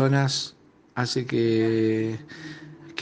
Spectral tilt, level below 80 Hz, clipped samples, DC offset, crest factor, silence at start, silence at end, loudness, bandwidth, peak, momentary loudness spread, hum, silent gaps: -5.5 dB/octave; -66 dBFS; under 0.1%; under 0.1%; 18 dB; 0 s; 0 s; -25 LUFS; 9.6 kHz; -8 dBFS; 18 LU; none; none